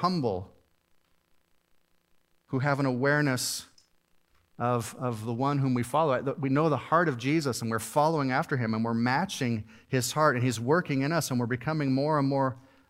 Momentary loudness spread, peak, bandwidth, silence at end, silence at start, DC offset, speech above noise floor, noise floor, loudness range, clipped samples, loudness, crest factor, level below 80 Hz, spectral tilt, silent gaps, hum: 7 LU; -8 dBFS; 16 kHz; 0.3 s; 0 s; under 0.1%; 40 dB; -68 dBFS; 4 LU; under 0.1%; -28 LUFS; 20 dB; -68 dBFS; -5.5 dB/octave; none; none